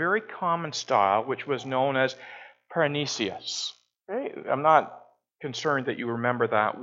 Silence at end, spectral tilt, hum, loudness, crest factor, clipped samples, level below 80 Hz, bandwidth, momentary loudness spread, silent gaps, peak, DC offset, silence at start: 0 s; -4 dB/octave; none; -27 LUFS; 22 dB; under 0.1%; -76 dBFS; 8 kHz; 13 LU; none; -4 dBFS; under 0.1%; 0 s